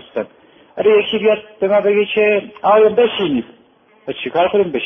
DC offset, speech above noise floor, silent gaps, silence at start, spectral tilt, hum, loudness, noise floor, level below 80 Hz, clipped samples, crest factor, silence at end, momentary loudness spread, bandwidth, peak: under 0.1%; 37 dB; none; 0.15 s; -8 dB/octave; none; -15 LUFS; -51 dBFS; -58 dBFS; under 0.1%; 14 dB; 0 s; 14 LU; 3.7 kHz; -2 dBFS